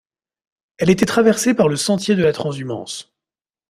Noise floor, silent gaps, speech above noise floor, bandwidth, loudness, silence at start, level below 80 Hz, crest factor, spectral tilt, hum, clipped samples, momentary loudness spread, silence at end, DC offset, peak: under -90 dBFS; none; over 73 dB; 15.5 kHz; -17 LUFS; 0.8 s; -54 dBFS; 18 dB; -5 dB/octave; none; under 0.1%; 13 LU; 0.65 s; under 0.1%; -2 dBFS